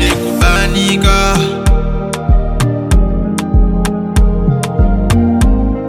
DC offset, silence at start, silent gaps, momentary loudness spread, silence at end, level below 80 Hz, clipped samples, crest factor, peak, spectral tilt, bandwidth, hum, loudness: under 0.1%; 0 s; none; 5 LU; 0 s; -14 dBFS; under 0.1%; 10 dB; 0 dBFS; -5.5 dB/octave; 15 kHz; none; -13 LUFS